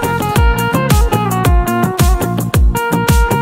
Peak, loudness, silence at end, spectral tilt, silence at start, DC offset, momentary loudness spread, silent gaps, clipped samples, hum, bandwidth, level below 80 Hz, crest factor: 0 dBFS; -13 LUFS; 0 s; -5.5 dB/octave; 0 s; under 0.1%; 2 LU; none; under 0.1%; none; 16.5 kHz; -16 dBFS; 12 dB